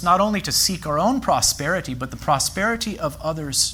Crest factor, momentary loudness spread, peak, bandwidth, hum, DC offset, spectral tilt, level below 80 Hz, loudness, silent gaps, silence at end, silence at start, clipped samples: 16 dB; 8 LU; -4 dBFS; over 20 kHz; none; under 0.1%; -3 dB/octave; -42 dBFS; -21 LUFS; none; 0 s; 0 s; under 0.1%